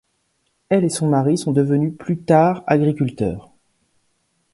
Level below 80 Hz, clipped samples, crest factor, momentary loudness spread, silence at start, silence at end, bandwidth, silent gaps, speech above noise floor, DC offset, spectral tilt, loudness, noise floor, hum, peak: -52 dBFS; under 0.1%; 18 dB; 10 LU; 0.7 s; 1.15 s; 11.5 kHz; none; 51 dB; under 0.1%; -7 dB/octave; -18 LUFS; -68 dBFS; none; -2 dBFS